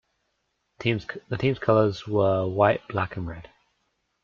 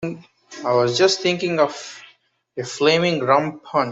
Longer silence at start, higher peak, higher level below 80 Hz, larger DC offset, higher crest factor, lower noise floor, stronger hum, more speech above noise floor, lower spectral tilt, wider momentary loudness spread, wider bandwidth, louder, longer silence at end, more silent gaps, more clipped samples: first, 0.8 s vs 0 s; about the same, -6 dBFS vs -4 dBFS; first, -56 dBFS vs -64 dBFS; neither; about the same, 20 dB vs 18 dB; first, -75 dBFS vs -56 dBFS; neither; first, 51 dB vs 36 dB; first, -8 dB/octave vs -4.5 dB/octave; second, 12 LU vs 17 LU; second, 7.2 kHz vs 8 kHz; second, -25 LUFS vs -19 LUFS; first, 0.8 s vs 0 s; neither; neither